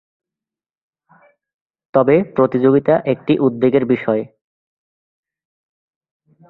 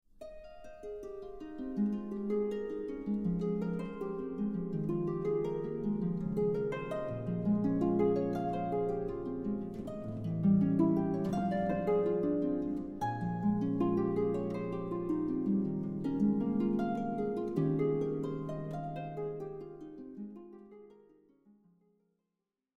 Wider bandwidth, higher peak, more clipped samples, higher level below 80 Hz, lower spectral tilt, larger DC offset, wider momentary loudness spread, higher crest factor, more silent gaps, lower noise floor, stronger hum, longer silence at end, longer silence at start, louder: second, 4.2 kHz vs 6.8 kHz; first, -2 dBFS vs -18 dBFS; neither; about the same, -60 dBFS vs -56 dBFS; about the same, -11 dB/octave vs -10 dB/octave; neither; second, 6 LU vs 15 LU; about the same, 18 dB vs 16 dB; neither; about the same, -89 dBFS vs -88 dBFS; neither; first, 2.25 s vs 1.8 s; first, 1.95 s vs 0.2 s; first, -16 LUFS vs -34 LUFS